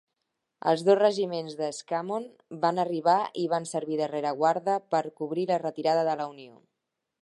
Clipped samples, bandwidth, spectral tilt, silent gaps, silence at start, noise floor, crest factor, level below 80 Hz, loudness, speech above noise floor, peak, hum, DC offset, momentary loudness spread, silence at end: under 0.1%; 11.5 kHz; -5.5 dB/octave; none; 0.65 s; -84 dBFS; 18 dB; -84 dBFS; -27 LUFS; 57 dB; -8 dBFS; none; under 0.1%; 10 LU; 0.75 s